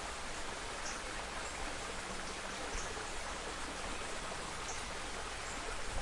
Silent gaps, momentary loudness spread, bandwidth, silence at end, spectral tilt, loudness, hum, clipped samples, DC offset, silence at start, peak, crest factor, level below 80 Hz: none; 1 LU; 11.5 kHz; 0 s; -2 dB/octave; -42 LUFS; none; under 0.1%; under 0.1%; 0 s; -28 dBFS; 14 dB; -50 dBFS